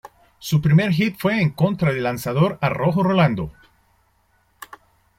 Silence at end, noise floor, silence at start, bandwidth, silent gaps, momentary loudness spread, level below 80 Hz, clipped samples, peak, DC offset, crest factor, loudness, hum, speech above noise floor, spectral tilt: 0.55 s; -62 dBFS; 0.05 s; 16 kHz; none; 17 LU; -50 dBFS; under 0.1%; -4 dBFS; under 0.1%; 16 dB; -20 LUFS; none; 44 dB; -7 dB/octave